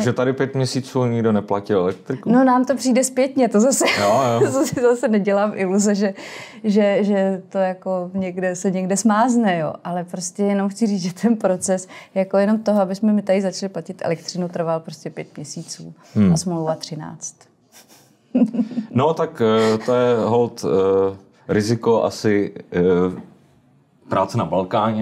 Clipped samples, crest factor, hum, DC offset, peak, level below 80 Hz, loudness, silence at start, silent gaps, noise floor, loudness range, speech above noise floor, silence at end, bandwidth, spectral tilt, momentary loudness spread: under 0.1%; 14 dB; none; under 0.1%; -6 dBFS; -60 dBFS; -19 LUFS; 0 s; none; -55 dBFS; 6 LU; 37 dB; 0 s; 16 kHz; -5.5 dB/octave; 11 LU